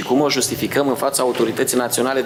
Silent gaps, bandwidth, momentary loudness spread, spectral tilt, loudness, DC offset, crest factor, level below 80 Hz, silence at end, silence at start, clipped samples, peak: none; 19 kHz; 2 LU; -3.5 dB/octave; -18 LUFS; under 0.1%; 12 dB; -60 dBFS; 0 s; 0 s; under 0.1%; -6 dBFS